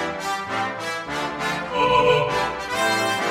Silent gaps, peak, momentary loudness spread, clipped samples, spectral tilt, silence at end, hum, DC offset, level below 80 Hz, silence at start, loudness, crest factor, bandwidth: none; -6 dBFS; 9 LU; under 0.1%; -3.5 dB/octave; 0 s; none; under 0.1%; -50 dBFS; 0 s; -22 LUFS; 18 dB; 16 kHz